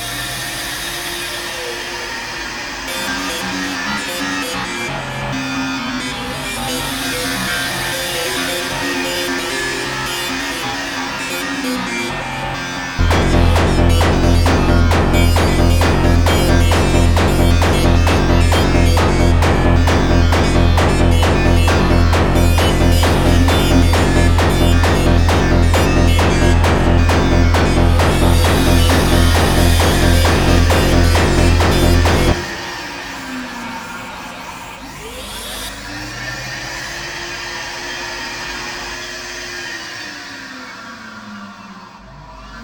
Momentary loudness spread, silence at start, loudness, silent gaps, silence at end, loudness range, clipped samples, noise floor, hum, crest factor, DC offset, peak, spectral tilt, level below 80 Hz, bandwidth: 13 LU; 0 s; -15 LUFS; none; 0 s; 12 LU; under 0.1%; -36 dBFS; none; 14 dB; under 0.1%; 0 dBFS; -5 dB/octave; -20 dBFS; 18 kHz